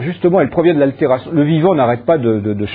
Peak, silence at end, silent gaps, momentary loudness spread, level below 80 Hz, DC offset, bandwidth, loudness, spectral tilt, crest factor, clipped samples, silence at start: 0 dBFS; 0 s; none; 3 LU; -48 dBFS; under 0.1%; 4.7 kHz; -14 LUFS; -11.5 dB/octave; 14 dB; under 0.1%; 0 s